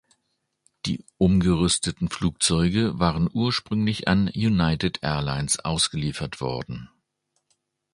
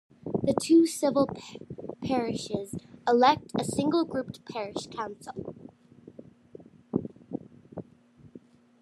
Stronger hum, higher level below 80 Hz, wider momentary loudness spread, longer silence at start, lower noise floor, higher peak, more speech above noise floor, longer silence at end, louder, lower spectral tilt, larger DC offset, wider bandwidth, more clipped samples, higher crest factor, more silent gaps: neither; first, -42 dBFS vs -66 dBFS; second, 10 LU vs 20 LU; first, 0.85 s vs 0.25 s; first, -76 dBFS vs -56 dBFS; first, -4 dBFS vs -8 dBFS; first, 52 dB vs 29 dB; first, 1.05 s vs 0.45 s; first, -24 LUFS vs -28 LUFS; about the same, -4.5 dB/octave vs -5.5 dB/octave; neither; second, 11.5 kHz vs 13 kHz; neither; about the same, 20 dB vs 22 dB; neither